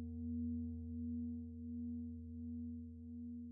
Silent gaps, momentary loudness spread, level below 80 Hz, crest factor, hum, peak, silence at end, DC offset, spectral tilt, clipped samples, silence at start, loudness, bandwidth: none; 7 LU; -62 dBFS; 10 dB; none; -36 dBFS; 0 s; under 0.1%; -11 dB/octave; under 0.1%; 0 s; -47 LUFS; 0.8 kHz